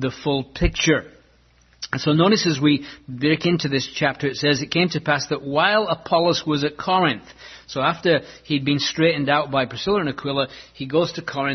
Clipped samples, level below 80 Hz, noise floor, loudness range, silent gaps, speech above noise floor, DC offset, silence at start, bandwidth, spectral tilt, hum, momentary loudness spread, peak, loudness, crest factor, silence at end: under 0.1%; -40 dBFS; -56 dBFS; 1 LU; none; 35 dB; under 0.1%; 0 s; 6.4 kHz; -5 dB/octave; none; 7 LU; -4 dBFS; -21 LUFS; 18 dB; 0 s